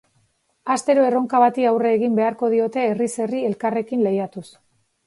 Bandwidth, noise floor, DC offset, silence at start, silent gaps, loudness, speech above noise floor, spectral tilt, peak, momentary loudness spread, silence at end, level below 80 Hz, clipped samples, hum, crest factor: 11.5 kHz; -65 dBFS; under 0.1%; 0.65 s; none; -20 LUFS; 45 dB; -6 dB/octave; -4 dBFS; 7 LU; 0.65 s; -70 dBFS; under 0.1%; none; 18 dB